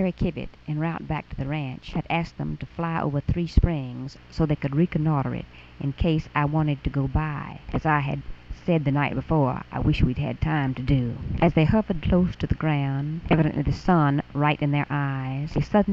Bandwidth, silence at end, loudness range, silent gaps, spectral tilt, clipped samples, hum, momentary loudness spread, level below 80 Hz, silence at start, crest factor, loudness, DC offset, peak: 7 kHz; 0 s; 4 LU; none; -9 dB/octave; under 0.1%; none; 10 LU; -34 dBFS; 0 s; 20 dB; -25 LUFS; under 0.1%; -4 dBFS